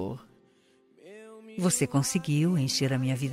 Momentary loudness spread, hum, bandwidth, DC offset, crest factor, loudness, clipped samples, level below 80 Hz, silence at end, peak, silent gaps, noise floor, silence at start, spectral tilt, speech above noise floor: 21 LU; none; 16 kHz; under 0.1%; 16 dB; -27 LUFS; under 0.1%; -66 dBFS; 0 s; -12 dBFS; none; -63 dBFS; 0 s; -5 dB/octave; 37 dB